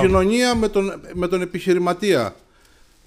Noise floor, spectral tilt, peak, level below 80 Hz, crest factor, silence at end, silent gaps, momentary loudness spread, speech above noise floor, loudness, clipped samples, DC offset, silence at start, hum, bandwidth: -52 dBFS; -5.5 dB/octave; -4 dBFS; -38 dBFS; 16 dB; 0.7 s; none; 9 LU; 34 dB; -20 LUFS; under 0.1%; under 0.1%; 0 s; none; 15 kHz